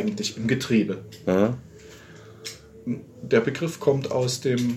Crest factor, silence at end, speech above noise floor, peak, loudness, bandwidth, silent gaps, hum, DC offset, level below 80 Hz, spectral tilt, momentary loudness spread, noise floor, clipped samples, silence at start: 18 dB; 0 s; 22 dB; -6 dBFS; -25 LUFS; 16 kHz; none; none; under 0.1%; -60 dBFS; -5.5 dB/octave; 16 LU; -46 dBFS; under 0.1%; 0 s